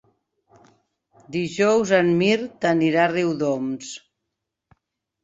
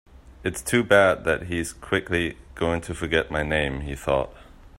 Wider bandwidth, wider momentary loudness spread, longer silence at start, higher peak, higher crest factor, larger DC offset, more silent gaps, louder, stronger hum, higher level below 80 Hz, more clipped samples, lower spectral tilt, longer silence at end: second, 8 kHz vs 16 kHz; about the same, 13 LU vs 12 LU; first, 1.3 s vs 0.15 s; about the same, -4 dBFS vs -4 dBFS; about the same, 18 dB vs 22 dB; neither; neither; first, -21 LUFS vs -24 LUFS; neither; second, -64 dBFS vs -42 dBFS; neither; about the same, -5.5 dB/octave vs -4.5 dB/octave; first, 1.25 s vs 0.1 s